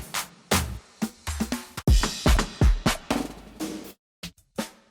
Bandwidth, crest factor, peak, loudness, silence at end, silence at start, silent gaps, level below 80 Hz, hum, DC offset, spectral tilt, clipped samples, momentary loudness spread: over 20 kHz; 18 dB; -8 dBFS; -27 LUFS; 0.2 s; 0 s; 3.99-4.23 s; -28 dBFS; none; under 0.1%; -4.5 dB/octave; under 0.1%; 16 LU